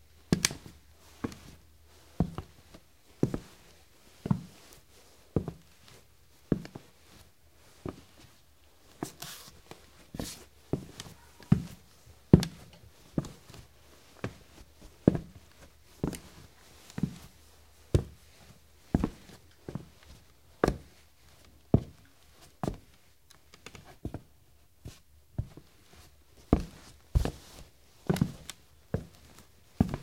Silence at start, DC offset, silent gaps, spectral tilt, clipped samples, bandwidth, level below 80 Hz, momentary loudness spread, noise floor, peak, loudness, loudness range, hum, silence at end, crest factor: 0.3 s; under 0.1%; none; -6 dB/octave; under 0.1%; 16.5 kHz; -46 dBFS; 26 LU; -63 dBFS; 0 dBFS; -34 LUFS; 13 LU; none; 0 s; 34 dB